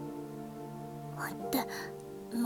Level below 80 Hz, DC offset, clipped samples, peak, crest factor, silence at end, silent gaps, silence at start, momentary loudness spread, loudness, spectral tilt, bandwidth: -66 dBFS; under 0.1%; under 0.1%; -18 dBFS; 20 dB; 0 s; none; 0 s; 10 LU; -39 LUFS; -5 dB/octave; 18 kHz